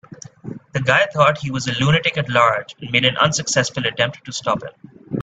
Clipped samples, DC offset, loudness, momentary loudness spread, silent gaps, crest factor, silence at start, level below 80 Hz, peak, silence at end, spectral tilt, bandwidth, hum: under 0.1%; under 0.1%; -18 LUFS; 12 LU; none; 20 dB; 0.1 s; -54 dBFS; 0 dBFS; 0 s; -4 dB/octave; 9.2 kHz; none